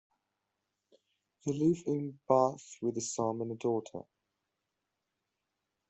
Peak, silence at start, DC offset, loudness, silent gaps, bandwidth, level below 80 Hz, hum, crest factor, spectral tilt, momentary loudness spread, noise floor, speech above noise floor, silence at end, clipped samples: -12 dBFS; 1.45 s; under 0.1%; -33 LUFS; none; 8.2 kHz; -74 dBFS; none; 24 dB; -6.5 dB/octave; 10 LU; -86 dBFS; 54 dB; 1.9 s; under 0.1%